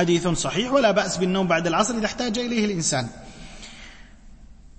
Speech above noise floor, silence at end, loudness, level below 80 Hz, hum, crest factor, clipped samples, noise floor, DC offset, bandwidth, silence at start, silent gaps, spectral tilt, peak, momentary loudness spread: 23 dB; 0.1 s; -22 LUFS; -46 dBFS; none; 18 dB; under 0.1%; -45 dBFS; under 0.1%; 8.8 kHz; 0 s; none; -4 dB/octave; -6 dBFS; 21 LU